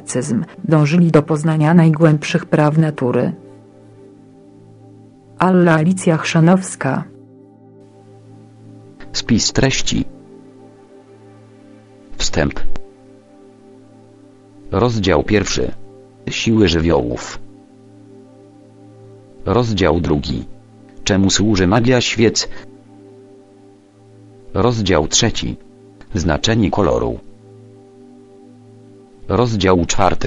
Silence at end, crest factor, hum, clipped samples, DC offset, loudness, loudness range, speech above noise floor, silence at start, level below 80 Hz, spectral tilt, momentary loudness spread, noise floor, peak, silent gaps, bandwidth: 0 s; 18 dB; none; under 0.1%; under 0.1%; -16 LUFS; 6 LU; 31 dB; 0 s; -34 dBFS; -5 dB/octave; 14 LU; -46 dBFS; 0 dBFS; none; 11 kHz